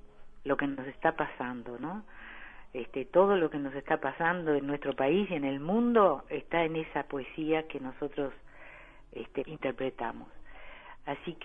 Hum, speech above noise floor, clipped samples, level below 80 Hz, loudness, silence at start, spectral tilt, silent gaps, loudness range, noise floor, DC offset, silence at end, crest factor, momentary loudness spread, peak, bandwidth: none; 20 dB; under 0.1%; -56 dBFS; -31 LUFS; 0 s; -8.5 dB/octave; none; 9 LU; -51 dBFS; under 0.1%; 0 s; 20 dB; 21 LU; -12 dBFS; 3.8 kHz